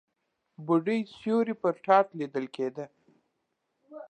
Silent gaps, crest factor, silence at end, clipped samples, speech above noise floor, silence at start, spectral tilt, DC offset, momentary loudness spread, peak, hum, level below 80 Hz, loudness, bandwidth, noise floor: none; 22 dB; 0.05 s; under 0.1%; 52 dB; 0.6 s; -7.5 dB/octave; under 0.1%; 15 LU; -8 dBFS; none; -80 dBFS; -28 LUFS; 9.2 kHz; -80 dBFS